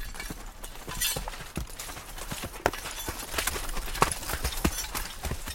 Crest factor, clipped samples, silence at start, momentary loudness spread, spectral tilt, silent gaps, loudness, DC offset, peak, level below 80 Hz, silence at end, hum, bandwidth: 30 dB; under 0.1%; 0 s; 11 LU; -2.5 dB/octave; none; -32 LUFS; under 0.1%; -2 dBFS; -40 dBFS; 0 s; none; 17 kHz